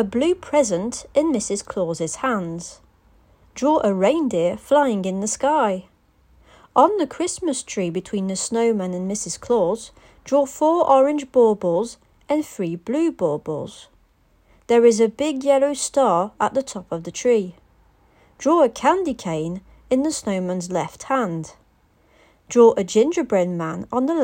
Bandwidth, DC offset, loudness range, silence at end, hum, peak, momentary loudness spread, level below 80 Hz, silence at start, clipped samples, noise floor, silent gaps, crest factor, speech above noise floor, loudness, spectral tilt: 16 kHz; under 0.1%; 4 LU; 0 s; none; 0 dBFS; 11 LU; -56 dBFS; 0 s; under 0.1%; -59 dBFS; none; 20 dB; 39 dB; -21 LUFS; -5 dB/octave